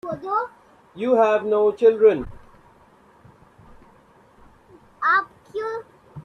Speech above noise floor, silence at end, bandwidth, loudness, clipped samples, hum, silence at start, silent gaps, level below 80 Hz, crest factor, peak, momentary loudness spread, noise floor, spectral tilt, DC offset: 36 dB; 0.05 s; 6.6 kHz; -20 LUFS; under 0.1%; none; 0.05 s; none; -54 dBFS; 18 dB; -4 dBFS; 17 LU; -54 dBFS; -6.5 dB/octave; under 0.1%